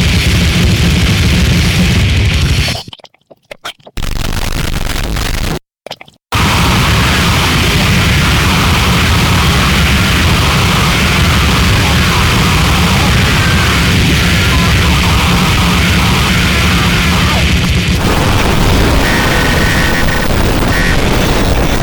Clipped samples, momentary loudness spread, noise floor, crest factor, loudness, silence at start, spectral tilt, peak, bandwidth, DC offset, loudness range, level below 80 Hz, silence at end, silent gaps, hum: under 0.1%; 8 LU; -41 dBFS; 10 dB; -10 LUFS; 0 s; -4.5 dB/octave; 0 dBFS; 19.5 kHz; under 0.1%; 6 LU; -16 dBFS; 0 s; none; none